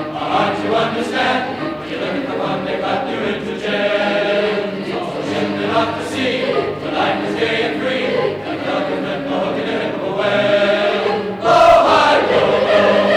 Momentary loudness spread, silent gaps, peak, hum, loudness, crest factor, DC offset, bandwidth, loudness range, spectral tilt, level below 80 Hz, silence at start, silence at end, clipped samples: 9 LU; none; -2 dBFS; none; -17 LUFS; 14 dB; under 0.1%; 12.5 kHz; 5 LU; -5 dB/octave; -48 dBFS; 0 s; 0 s; under 0.1%